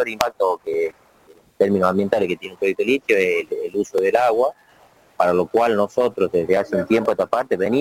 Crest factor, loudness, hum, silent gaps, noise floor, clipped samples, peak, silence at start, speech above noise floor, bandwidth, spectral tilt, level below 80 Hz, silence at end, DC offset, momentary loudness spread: 20 dB; -20 LUFS; none; none; -53 dBFS; under 0.1%; 0 dBFS; 0 s; 33 dB; 16.5 kHz; -5.5 dB/octave; -58 dBFS; 0 s; under 0.1%; 6 LU